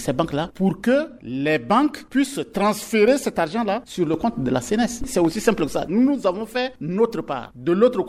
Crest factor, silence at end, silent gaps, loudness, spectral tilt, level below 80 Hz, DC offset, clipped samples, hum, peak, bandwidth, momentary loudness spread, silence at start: 18 dB; 0 s; none; -22 LUFS; -5.5 dB/octave; -48 dBFS; under 0.1%; under 0.1%; none; -2 dBFS; 16 kHz; 7 LU; 0 s